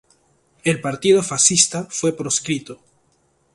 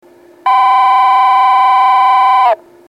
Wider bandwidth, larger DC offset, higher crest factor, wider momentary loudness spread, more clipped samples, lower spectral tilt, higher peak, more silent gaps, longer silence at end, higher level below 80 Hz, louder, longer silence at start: second, 11.5 kHz vs 15.5 kHz; neither; first, 22 dB vs 8 dB; first, 11 LU vs 4 LU; neither; first, -3 dB/octave vs -0.5 dB/octave; about the same, 0 dBFS vs 0 dBFS; neither; first, 0.8 s vs 0.35 s; first, -60 dBFS vs -74 dBFS; second, -18 LUFS vs -9 LUFS; first, 0.65 s vs 0.45 s